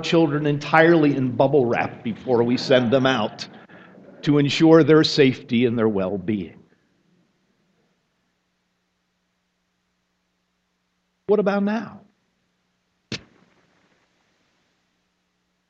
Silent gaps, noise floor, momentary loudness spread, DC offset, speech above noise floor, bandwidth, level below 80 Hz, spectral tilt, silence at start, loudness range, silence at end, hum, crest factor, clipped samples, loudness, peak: none; -72 dBFS; 20 LU; under 0.1%; 54 dB; 8 kHz; -60 dBFS; -6.5 dB/octave; 0 s; 12 LU; 2.5 s; 60 Hz at -55 dBFS; 22 dB; under 0.1%; -19 LUFS; 0 dBFS